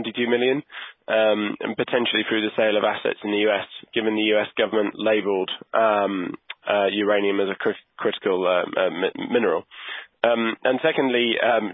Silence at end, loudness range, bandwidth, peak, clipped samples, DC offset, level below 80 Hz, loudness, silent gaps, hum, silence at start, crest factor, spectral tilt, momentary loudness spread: 0 s; 1 LU; 4 kHz; -4 dBFS; under 0.1%; under 0.1%; -70 dBFS; -22 LUFS; none; none; 0 s; 18 dB; -9 dB/octave; 7 LU